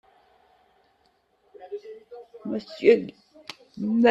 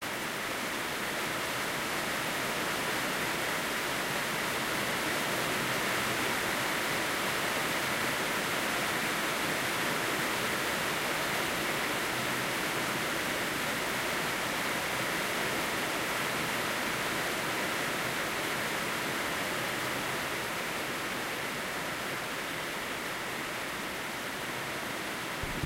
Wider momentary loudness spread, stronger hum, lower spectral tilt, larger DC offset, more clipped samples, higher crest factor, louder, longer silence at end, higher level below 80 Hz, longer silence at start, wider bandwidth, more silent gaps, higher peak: first, 24 LU vs 5 LU; neither; first, -6.5 dB/octave vs -2.5 dB/octave; neither; neither; first, 22 dB vs 14 dB; first, -24 LUFS vs -31 LUFS; about the same, 0 s vs 0 s; second, -72 dBFS vs -58 dBFS; first, 1.6 s vs 0 s; second, 8 kHz vs 16 kHz; neither; first, -6 dBFS vs -18 dBFS